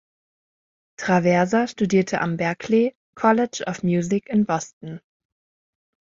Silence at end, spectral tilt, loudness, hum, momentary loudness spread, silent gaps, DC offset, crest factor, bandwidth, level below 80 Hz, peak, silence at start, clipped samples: 1.15 s; -6 dB/octave; -21 LUFS; none; 11 LU; 2.95-3.13 s, 4.73-4.81 s; under 0.1%; 18 dB; 7.8 kHz; -60 dBFS; -4 dBFS; 1 s; under 0.1%